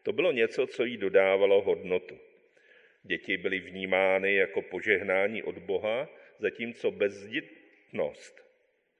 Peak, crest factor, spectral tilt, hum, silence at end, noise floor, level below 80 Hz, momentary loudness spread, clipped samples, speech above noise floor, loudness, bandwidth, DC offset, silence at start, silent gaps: -8 dBFS; 22 dB; -5.5 dB/octave; none; 0.7 s; -71 dBFS; -70 dBFS; 11 LU; under 0.1%; 42 dB; -29 LUFS; 9 kHz; under 0.1%; 0.05 s; none